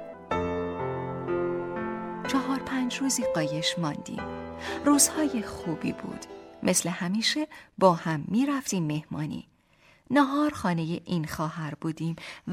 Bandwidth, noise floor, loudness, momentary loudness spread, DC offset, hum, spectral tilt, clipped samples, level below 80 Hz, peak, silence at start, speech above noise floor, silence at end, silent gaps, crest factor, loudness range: 16 kHz; -61 dBFS; -28 LUFS; 12 LU; under 0.1%; none; -4 dB/octave; under 0.1%; -58 dBFS; -6 dBFS; 0 s; 33 dB; 0 s; none; 22 dB; 3 LU